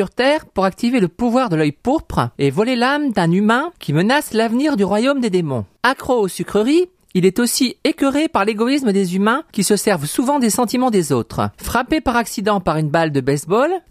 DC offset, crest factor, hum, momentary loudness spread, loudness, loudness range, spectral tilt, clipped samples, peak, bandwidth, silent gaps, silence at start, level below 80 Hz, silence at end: under 0.1%; 16 dB; none; 3 LU; -17 LUFS; 1 LU; -5 dB/octave; under 0.1%; -2 dBFS; 15.5 kHz; none; 0 s; -44 dBFS; 0.1 s